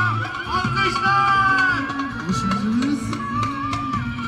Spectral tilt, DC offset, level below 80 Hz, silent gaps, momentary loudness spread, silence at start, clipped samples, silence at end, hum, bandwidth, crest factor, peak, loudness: -5 dB/octave; under 0.1%; -42 dBFS; none; 9 LU; 0 s; under 0.1%; 0 s; none; 13 kHz; 14 dB; -6 dBFS; -20 LUFS